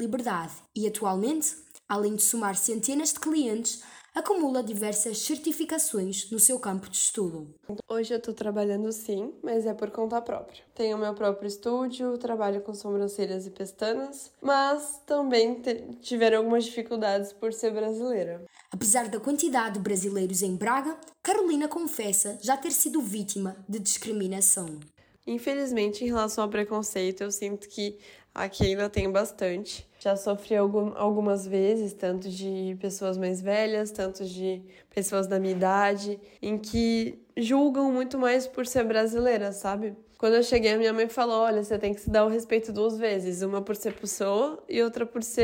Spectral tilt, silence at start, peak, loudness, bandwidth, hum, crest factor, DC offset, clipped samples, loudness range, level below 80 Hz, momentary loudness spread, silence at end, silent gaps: -3.5 dB/octave; 0 s; -6 dBFS; -27 LUFS; over 20 kHz; none; 22 dB; under 0.1%; under 0.1%; 5 LU; -56 dBFS; 10 LU; 0 s; none